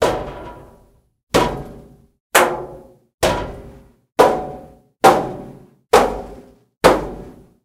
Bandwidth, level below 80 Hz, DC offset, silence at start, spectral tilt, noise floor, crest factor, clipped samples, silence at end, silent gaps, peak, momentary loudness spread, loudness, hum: 17.5 kHz; -40 dBFS; under 0.1%; 0 s; -4 dB/octave; -53 dBFS; 20 dB; under 0.1%; 0.35 s; 1.23-1.27 s, 2.20-2.30 s, 3.14-3.18 s, 6.77-6.81 s; 0 dBFS; 22 LU; -17 LUFS; none